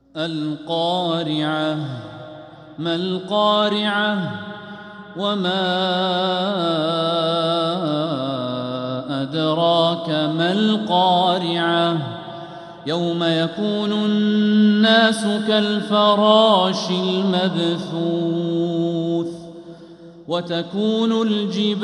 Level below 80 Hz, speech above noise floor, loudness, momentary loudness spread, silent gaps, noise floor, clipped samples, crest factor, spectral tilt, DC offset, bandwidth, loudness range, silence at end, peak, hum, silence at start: -66 dBFS; 22 dB; -19 LUFS; 15 LU; none; -41 dBFS; under 0.1%; 18 dB; -6 dB/octave; under 0.1%; 11.5 kHz; 6 LU; 0 s; -2 dBFS; none; 0.15 s